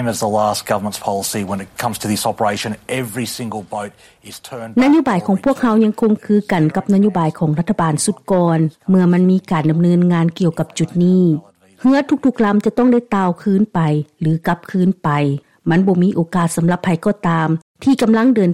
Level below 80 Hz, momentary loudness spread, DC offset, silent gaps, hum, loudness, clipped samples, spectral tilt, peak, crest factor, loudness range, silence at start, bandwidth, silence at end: -52 dBFS; 10 LU; under 0.1%; 17.62-17.75 s; none; -16 LUFS; under 0.1%; -6.5 dB/octave; -2 dBFS; 12 dB; 5 LU; 0 s; 14.5 kHz; 0 s